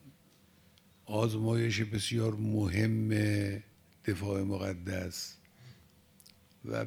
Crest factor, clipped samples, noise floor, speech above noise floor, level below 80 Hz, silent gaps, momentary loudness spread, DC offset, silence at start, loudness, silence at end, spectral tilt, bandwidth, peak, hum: 20 dB; under 0.1%; -64 dBFS; 32 dB; -64 dBFS; none; 10 LU; under 0.1%; 0.05 s; -33 LUFS; 0 s; -6 dB/octave; 15.5 kHz; -14 dBFS; none